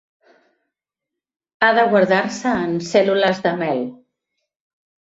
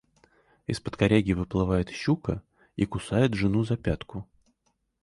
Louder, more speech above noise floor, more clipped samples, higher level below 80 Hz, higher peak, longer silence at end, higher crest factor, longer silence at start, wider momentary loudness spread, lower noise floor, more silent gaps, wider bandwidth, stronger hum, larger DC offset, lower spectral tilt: first, -18 LUFS vs -27 LUFS; first, 67 dB vs 48 dB; neither; second, -60 dBFS vs -44 dBFS; first, -2 dBFS vs -8 dBFS; first, 1.1 s vs 0.8 s; about the same, 18 dB vs 20 dB; first, 1.6 s vs 0.7 s; second, 8 LU vs 14 LU; first, -85 dBFS vs -74 dBFS; neither; second, 8 kHz vs 11.5 kHz; neither; neither; second, -5 dB/octave vs -7 dB/octave